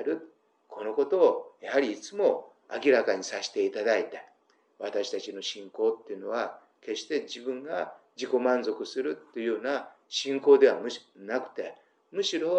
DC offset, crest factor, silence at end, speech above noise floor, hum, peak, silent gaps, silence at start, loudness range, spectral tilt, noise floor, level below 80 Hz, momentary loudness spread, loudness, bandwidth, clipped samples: under 0.1%; 20 dB; 0 s; 39 dB; none; -8 dBFS; none; 0 s; 6 LU; -3 dB/octave; -66 dBFS; under -90 dBFS; 15 LU; -29 LUFS; 8.8 kHz; under 0.1%